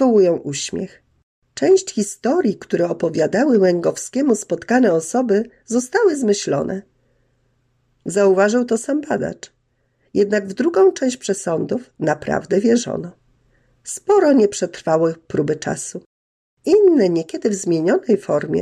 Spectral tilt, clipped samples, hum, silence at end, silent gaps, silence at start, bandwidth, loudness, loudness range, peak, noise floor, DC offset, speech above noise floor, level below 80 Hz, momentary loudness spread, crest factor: -5 dB/octave; under 0.1%; none; 0 s; 1.23-1.42 s, 16.06-16.57 s; 0 s; 12.5 kHz; -18 LUFS; 3 LU; -4 dBFS; -65 dBFS; under 0.1%; 48 dB; -60 dBFS; 12 LU; 14 dB